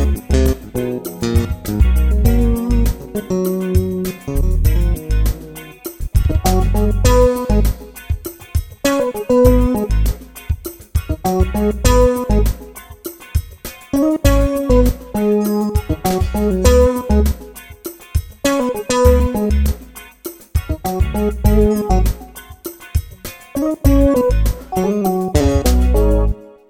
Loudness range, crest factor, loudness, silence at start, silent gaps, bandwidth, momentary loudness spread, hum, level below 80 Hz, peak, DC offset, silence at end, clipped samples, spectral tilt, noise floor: 3 LU; 16 dB; -17 LUFS; 0 s; none; 17 kHz; 17 LU; none; -18 dBFS; 0 dBFS; under 0.1%; 0.25 s; under 0.1%; -6.5 dB/octave; -37 dBFS